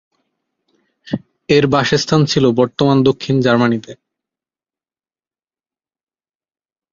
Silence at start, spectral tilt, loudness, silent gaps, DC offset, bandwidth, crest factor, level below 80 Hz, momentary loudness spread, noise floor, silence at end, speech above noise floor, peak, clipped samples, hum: 1.05 s; -6 dB/octave; -14 LUFS; none; under 0.1%; 7.6 kHz; 16 dB; -50 dBFS; 13 LU; under -90 dBFS; 3 s; over 77 dB; 0 dBFS; under 0.1%; none